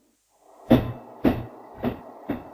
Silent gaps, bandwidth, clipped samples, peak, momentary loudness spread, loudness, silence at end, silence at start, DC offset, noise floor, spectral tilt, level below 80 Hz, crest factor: none; 16 kHz; under 0.1%; -4 dBFS; 15 LU; -26 LUFS; 0.05 s; 0.65 s; under 0.1%; -61 dBFS; -8.5 dB/octave; -44 dBFS; 24 dB